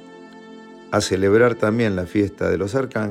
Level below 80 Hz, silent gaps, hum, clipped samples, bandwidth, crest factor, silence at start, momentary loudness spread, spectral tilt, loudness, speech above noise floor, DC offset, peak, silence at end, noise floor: -52 dBFS; none; none; under 0.1%; 15 kHz; 16 dB; 0 s; 7 LU; -6 dB/octave; -20 LUFS; 22 dB; under 0.1%; -4 dBFS; 0 s; -41 dBFS